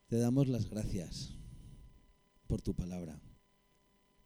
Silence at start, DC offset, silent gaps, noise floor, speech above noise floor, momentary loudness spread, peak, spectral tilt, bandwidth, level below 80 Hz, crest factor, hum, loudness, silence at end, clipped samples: 0.1 s; under 0.1%; none; -72 dBFS; 36 dB; 23 LU; -18 dBFS; -7 dB/octave; over 20 kHz; -50 dBFS; 20 dB; none; -37 LUFS; 0.9 s; under 0.1%